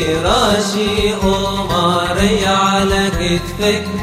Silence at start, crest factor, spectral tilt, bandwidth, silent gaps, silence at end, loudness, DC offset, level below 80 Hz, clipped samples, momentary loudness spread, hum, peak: 0 s; 14 dB; -4.5 dB/octave; 16 kHz; none; 0 s; -15 LUFS; 0.1%; -28 dBFS; under 0.1%; 4 LU; none; 0 dBFS